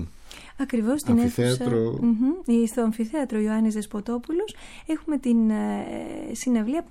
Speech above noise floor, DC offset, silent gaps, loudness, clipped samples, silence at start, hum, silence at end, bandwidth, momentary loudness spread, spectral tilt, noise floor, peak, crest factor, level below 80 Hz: 20 dB; under 0.1%; none; -25 LUFS; under 0.1%; 0 s; none; 0.05 s; 15 kHz; 12 LU; -6.5 dB/octave; -43 dBFS; -8 dBFS; 16 dB; -50 dBFS